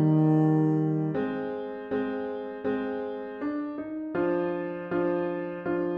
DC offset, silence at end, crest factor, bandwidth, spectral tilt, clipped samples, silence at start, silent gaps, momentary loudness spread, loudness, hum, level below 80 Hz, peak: under 0.1%; 0 s; 14 dB; 4.9 kHz; -10.5 dB/octave; under 0.1%; 0 s; none; 11 LU; -29 LUFS; none; -64 dBFS; -14 dBFS